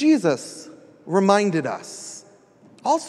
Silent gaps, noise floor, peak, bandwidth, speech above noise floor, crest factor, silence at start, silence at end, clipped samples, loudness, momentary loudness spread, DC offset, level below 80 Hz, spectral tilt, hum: none; -52 dBFS; -2 dBFS; 12 kHz; 31 dB; 20 dB; 0 s; 0 s; under 0.1%; -21 LUFS; 21 LU; under 0.1%; -76 dBFS; -5.5 dB/octave; none